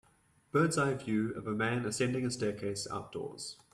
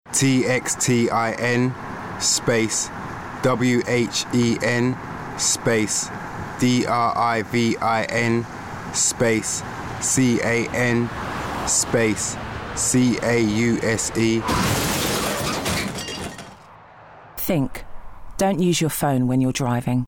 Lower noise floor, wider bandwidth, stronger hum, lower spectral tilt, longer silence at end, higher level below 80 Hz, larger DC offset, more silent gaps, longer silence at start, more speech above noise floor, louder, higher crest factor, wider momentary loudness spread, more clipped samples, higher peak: first, -68 dBFS vs -45 dBFS; second, 13.5 kHz vs 18 kHz; neither; about the same, -5 dB/octave vs -4 dB/octave; first, 0.2 s vs 0 s; second, -66 dBFS vs -44 dBFS; neither; neither; first, 0.55 s vs 0.05 s; first, 35 dB vs 25 dB; second, -34 LUFS vs -21 LUFS; about the same, 16 dB vs 12 dB; about the same, 11 LU vs 11 LU; neither; second, -18 dBFS vs -8 dBFS